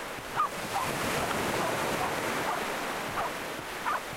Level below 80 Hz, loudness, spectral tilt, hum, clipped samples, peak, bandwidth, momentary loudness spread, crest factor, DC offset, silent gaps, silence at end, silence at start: -56 dBFS; -31 LUFS; -3 dB/octave; none; under 0.1%; -16 dBFS; 16 kHz; 4 LU; 16 dB; under 0.1%; none; 0 s; 0 s